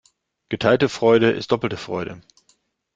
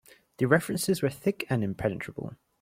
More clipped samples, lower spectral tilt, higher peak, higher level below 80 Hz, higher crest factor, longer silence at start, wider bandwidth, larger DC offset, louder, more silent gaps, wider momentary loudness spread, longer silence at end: neither; about the same, -6 dB/octave vs -5.5 dB/octave; first, -2 dBFS vs -8 dBFS; about the same, -58 dBFS vs -60 dBFS; about the same, 20 dB vs 22 dB; about the same, 0.5 s vs 0.4 s; second, 7.8 kHz vs 16.5 kHz; neither; first, -20 LUFS vs -28 LUFS; neither; about the same, 13 LU vs 13 LU; first, 0.75 s vs 0.25 s